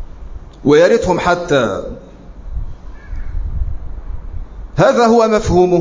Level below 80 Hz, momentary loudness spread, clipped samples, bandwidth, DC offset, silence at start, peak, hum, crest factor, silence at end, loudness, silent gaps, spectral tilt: -26 dBFS; 22 LU; under 0.1%; 7.6 kHz; under 0.1%; 0 s; 0 dBFS; none; 14 dB; 0 s; -13 LUFS; none; -6 dB/octave